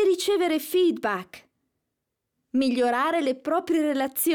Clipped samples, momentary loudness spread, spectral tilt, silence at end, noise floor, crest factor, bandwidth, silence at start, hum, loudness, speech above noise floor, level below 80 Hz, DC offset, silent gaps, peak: under 0.1%; 7 LU; -3 dB/octave; 0 s; -82 dBFS; 10 dB; over 20 kHz; 0 s; none; -24 LUFS; 58 dB; -70 dBFS; under 0.1%; none; -14 dBFS